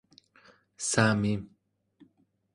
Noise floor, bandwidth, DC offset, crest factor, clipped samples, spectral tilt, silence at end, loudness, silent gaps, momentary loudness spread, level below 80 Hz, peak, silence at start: -69 dBFS; 11.5 kHz; under 0.1%; 24 dB; under 0.1%; -4.5 dB/octave; 1.1 s; -28 LUFS; none; 13 LU; -60 dBFS; -8 dBFS; 0.8 s